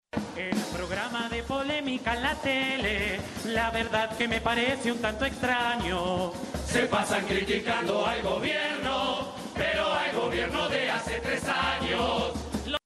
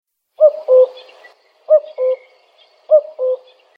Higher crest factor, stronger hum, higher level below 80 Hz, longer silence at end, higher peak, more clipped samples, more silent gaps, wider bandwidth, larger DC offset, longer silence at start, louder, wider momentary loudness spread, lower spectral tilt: about the same, 18 dB vs 16 dB; neither; first, -46 dBFS vs -84 dBFS; second, 0.1 s vs 0.4 s; second, -10 dBFS vs 0 dBFS; neither; neither; first, 13 kHz vs 5 kHz; neither; second, 0.15 s vs 0.4 s; second, -28 LUFS vs -15 LUFS; second, 5 LU vs 9 LU; about the same, -4 dB/octave vs -3 dB/octave